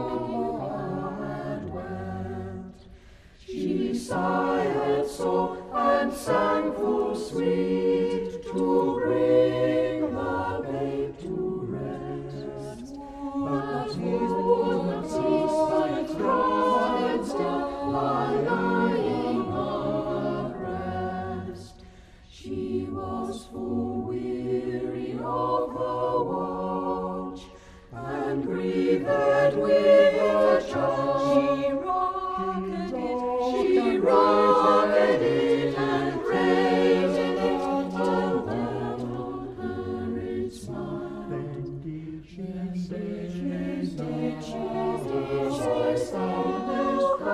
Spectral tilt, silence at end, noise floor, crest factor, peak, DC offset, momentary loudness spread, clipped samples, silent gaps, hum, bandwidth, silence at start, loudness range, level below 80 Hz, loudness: -6.5 dB/octave; 0 s; -50 dBFS; 18 dB; -8 dBFS; under 0.1%; 13 LU; under 0.1%; none; none; 13 kHz; 0 s; 11 LU; -52 dBFS; -26 LUFS